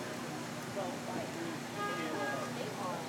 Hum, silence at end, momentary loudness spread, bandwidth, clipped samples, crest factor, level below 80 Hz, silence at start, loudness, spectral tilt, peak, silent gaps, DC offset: 60 Hz at -50 dBFS; 0 s; 4 LU; over 20 kHz; under 0.1%; 14 dB; -76 dBFS; 0 s; -39 LUFS; -4 dB/octave; -26 dBFS; none; under 0.1%